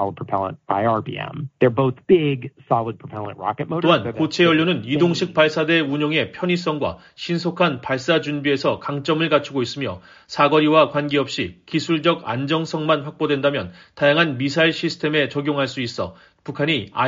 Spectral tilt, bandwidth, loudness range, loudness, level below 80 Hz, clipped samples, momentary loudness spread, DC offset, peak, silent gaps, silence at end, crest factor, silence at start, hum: -4 dB/octave; 7.4 kHz; 3 LU; -20 LUFS; -58 dBFS; under 0.1%; 11 LU; under 0.1%; -2 dBFS; none; 0 s; 18 dB; 0 s; none